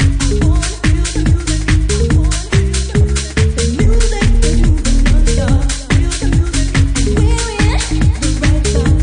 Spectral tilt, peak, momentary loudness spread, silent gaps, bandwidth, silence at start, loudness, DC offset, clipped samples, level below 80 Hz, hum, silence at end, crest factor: -5 dB/octave; -2 dBFS; 2 LU; none; 10.5 kHz; 0 s; -14 LUFS; under 0.1%; under 0.1%; -14 dBFS; none; 0 s; 10 dB